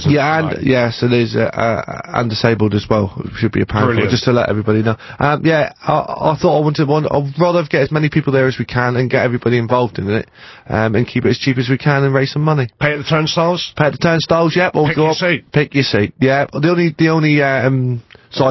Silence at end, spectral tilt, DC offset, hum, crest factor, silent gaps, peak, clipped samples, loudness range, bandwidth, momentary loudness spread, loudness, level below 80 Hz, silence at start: 0 s; -7 dB/octave; under 0.1%; none; 14 dB; none; 0 dBFS; under 0.1%; 2 LU; 6.2 kHz; 4 LU; -15 LUFS; -42 dBFS; 0 s